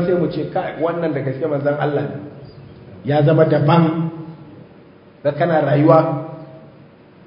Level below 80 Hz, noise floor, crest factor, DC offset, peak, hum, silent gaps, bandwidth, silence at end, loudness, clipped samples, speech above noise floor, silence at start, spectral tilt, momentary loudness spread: -56 dBFS; -45 dBFS; 18 dB; under 0.1%; 0 dBFS; none; none; 5.4 kHz; 0.6 s; -17 LUFS; under 0.1%; 28 dB; 0 s; -11.5 dB/octave; 20 LU